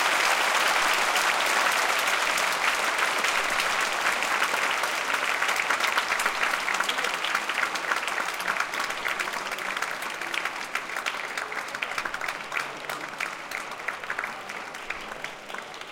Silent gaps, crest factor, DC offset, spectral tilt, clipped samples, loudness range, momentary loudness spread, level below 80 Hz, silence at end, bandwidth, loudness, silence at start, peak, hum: none; 18 dB; under 0.1%; 0 dB/octave; under 0.1%; 9 LU; 11 LU; -62 dBFS; 0 s; 17 kHz; -26 LUFS; 0 s; -10 dBFS; none